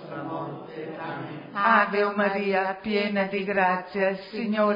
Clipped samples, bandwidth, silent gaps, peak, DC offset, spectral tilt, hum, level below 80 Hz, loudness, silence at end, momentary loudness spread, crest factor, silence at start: under 0.1%; 5.4 kHz; none; -4 dBFS; under 0.1%; -8 dB/octave; none; -68 dBFS; -25 LUFS; 0 s; 14 LU; 20 dB; 0 s